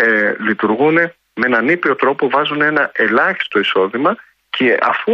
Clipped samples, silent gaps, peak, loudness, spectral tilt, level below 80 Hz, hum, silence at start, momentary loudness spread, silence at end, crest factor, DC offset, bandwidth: under 0.1%; none; -2 dBFS; -15 LUFS; -6.5 dB/octave; -64 dBFS; none; 0 s; 5 LU; 0 s; 14 dB; under 0.1%; 6.4 kHz